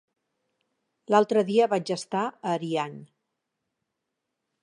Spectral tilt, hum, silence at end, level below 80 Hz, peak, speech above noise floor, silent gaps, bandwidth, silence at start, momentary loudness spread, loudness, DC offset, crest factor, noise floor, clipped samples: -5.5 dB/octave; none; 1.6 s; -82 dBFS; -8 dBFS; 58 dB; none; 11 kHz; 1.1 s; 8 LU; -26 LUFS; under 0.1%; 20 dB; -83 dBFS; under 0.1%